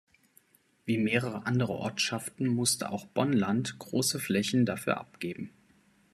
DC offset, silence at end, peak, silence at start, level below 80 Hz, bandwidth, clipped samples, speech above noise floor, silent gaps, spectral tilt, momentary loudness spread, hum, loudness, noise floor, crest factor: under 0.1%; 0.65 s; -10 dBFS; 0.85 s; -68 dBFS; 14 kHz; under 0.1%; 35 dB; none; -4.5 dB/octave; 11 LU; none; -30 LUFS; -65 dBFS; 20 dB